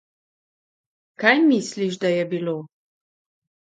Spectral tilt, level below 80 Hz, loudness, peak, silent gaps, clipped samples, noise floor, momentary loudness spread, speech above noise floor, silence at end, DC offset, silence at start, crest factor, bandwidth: -5 dB/octave; -74 dBFS; -21 LUFS; -2 dBFS; none; under 0.1%; under -90 dBFS; 11 LU; over 70 dB; 1.05 s; under 0.1%; 1.2 s; 22 dB; 9.4 kHz